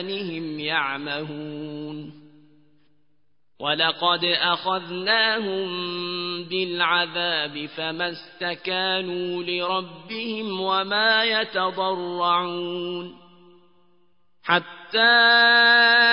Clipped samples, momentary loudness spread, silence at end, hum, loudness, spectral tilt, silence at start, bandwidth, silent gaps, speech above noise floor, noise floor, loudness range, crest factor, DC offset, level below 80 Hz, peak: under 0.1%; 17 LU; 0 s; none; -21 LUFS; -8 dB/octave; 0 s; 5.4 kHz; none; 51 dB; -74 dBFS; 6 LU; 18 dB; 0.1%; -76 dBFS; -6 dBFS